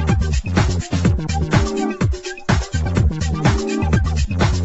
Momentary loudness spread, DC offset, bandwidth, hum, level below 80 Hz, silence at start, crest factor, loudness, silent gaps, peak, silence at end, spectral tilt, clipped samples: 3 LU; under 0.1%; 8.2 kHz; none; -24 dBFS; 0 s; 16 dB; -19 LUFS; none; 0 dBFS; 0 s; -6 dB/octave; under 0.1%